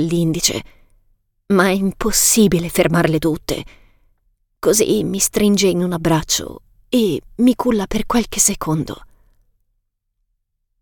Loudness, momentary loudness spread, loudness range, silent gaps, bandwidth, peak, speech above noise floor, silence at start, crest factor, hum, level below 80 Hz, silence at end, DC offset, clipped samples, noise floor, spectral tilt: -17 LUFS; 8 LU; 3 LU; none; 19 kHz; -2 dBFS; 54 dB; 0 s; 18 dB; none; -38 dBFS; 1.75 s; under 0.1%; under 0.1%; -71 dBFS; -4 dB/octave